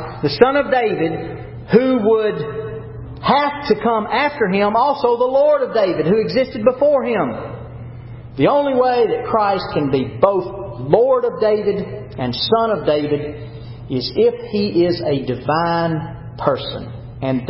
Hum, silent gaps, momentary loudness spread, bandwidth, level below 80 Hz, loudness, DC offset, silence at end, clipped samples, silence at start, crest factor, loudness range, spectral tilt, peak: none; none; 15 LU; 5.8 kHz; -44 dBFS; -17 LUFS; under 0.1%; 0 s; under 0.1%; 0 s; 18 dB; 3 LU; -10.5 dB/octave; 0 dBFS